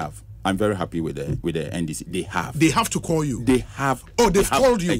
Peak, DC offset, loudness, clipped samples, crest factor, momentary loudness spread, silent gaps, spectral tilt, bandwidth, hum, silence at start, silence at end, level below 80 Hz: -6 dBFS; under 0.1%; -22 LUFS; under 0.1%; 16 dB; 9 LU; none; -5 dB/octave; 16 kHz; none; 0 s; 0 s; -40 dBFS